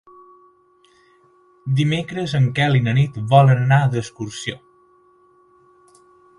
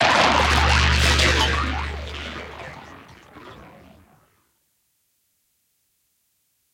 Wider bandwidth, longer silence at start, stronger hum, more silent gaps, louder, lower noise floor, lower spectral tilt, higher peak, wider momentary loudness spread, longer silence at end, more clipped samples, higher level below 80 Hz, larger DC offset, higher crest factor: second, 11 kHz vs 16 kHz; first, 1.65 s vs 0 s; neither; neither; about the same, -18 LUFS vs -19 LUFS; second, -56 dBFS vs -69 dBFS; first, -7 dB/octave vs -3.5 dB/octave; first, 0 dBFS vs -4 dBFS; second, 16 LU vs 26 LU; second, 1.8 s vs 3.1 s; neither; second, -54 dBFS vs -30 dBFS; neither; about the same, 20 dB vs 20 dB